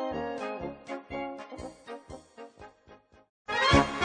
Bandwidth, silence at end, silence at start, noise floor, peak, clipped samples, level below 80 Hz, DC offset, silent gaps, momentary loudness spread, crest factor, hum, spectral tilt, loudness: 9.8 kHz; 0 s; 0 s; -57 dBFS; -8 dBFS; under 0.1%; -46 dBFS; under 0.1%; 3.29-3.45 s; 26 LU; 24 dB; none; -5 dB/octave; -30 LUFS